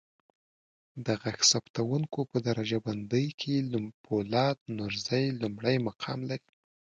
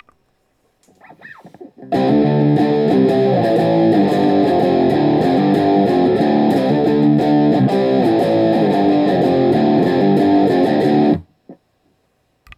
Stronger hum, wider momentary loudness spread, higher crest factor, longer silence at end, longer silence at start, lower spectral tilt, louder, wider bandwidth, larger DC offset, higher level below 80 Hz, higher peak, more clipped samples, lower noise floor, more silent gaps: neither; first, 11 LU vs 1 LU; first, 22 dB vs 12 dB; second, 0.55 s vs 1.05 s; second, 0.95 s vs 1.3 s; second, -4.5 dB/octave vs -8.5 dB/octave; second, -30 LUFS vs -14 LUFS; second, 9.6 kHz vs 11 kHz; neither; second, -66 dBFS vs -54 dBFS; second, -10 dBFS vs -2 dBFS; neither; first, under -90 dBFS vs -63 dBFS; first, 1.70-1.74 s, 3.34-3.38 s, 3.94-4.04 s, 4.61-4.66 s vs none